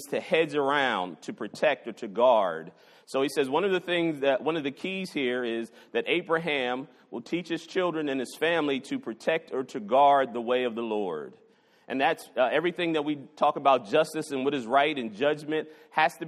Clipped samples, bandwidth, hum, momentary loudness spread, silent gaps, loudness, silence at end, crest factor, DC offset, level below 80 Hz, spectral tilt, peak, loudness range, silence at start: under 0.1%; 13 kHz; none; 11 LU; none; -27 LUFS; 0 s; 20 dB; under 0.1%; -76 dBFS; -5 dB/octave; -8 dBFS; 3 LU; 0 s